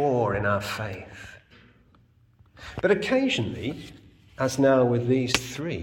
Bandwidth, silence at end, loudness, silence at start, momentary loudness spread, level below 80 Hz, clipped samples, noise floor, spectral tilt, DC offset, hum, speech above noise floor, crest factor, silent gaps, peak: 18 kHz; 0 s; -25 LUFS; 0 s; 21 LU; -54 dBFS; under 0.1%; -59 dBFS; -5 dB/octave; under 0.1%; none; 35 dB; 26 dB; none; -2 dBFS